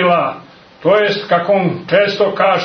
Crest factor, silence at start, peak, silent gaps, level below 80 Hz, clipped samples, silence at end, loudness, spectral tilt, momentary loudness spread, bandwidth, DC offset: 14 dB; 0 s; 0 dBFS; none; -58 dBFS; under 0.1%; 0 s; -14 LUFS; -6.5 dB/octave; 7 LU; 6.4 kHz; under 0.1%